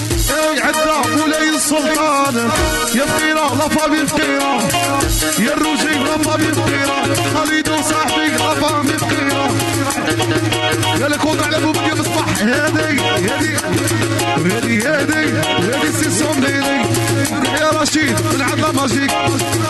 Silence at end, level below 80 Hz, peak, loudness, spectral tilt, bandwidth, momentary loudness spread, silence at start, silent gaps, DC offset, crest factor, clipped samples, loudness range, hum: 0 s; -34 dBFS; -4 dBFS; -15 LUFS; -3.5 dB/octave; 12.5 kHz; 2 LU; 0 s; none; under 0.1%; 10 dB; under 0.1%; 1 LU; none